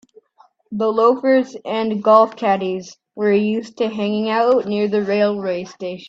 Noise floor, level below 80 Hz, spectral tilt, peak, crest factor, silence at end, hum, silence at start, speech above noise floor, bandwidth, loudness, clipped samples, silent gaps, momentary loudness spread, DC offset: -55 dBFS; -66 dBFS; -6.5 dB/octave; 0 dBFS; 18 dB; 0 s; none; 0.7 s; 38 dB; 7.8 kHz; -18 LUFS; under 0.1%; none; 12 LU; under 0.1%